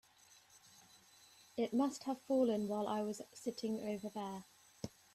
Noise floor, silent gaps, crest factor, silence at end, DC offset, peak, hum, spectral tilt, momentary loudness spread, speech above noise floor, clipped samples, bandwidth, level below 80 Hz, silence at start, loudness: -66 dBFS; none; 16 dB; 0.25 s; under 0.1%; -24 dBFS; none; -5.5 dB/octave; 16 LU; 28 dB; under 0.1%; 13.5 kHz; -80 dBFS; 0.55 s; -40 LUFS